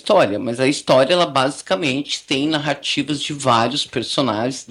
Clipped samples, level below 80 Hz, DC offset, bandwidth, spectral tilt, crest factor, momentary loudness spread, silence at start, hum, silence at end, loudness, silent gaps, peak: under 0.1%; -60 dBFS; under 0.1%; 12 kHz; -4 dB/octave; 16 dB; 6 LU; 0.05 s; none; 0.05 s; -18 LUFS; none; -2 dBFS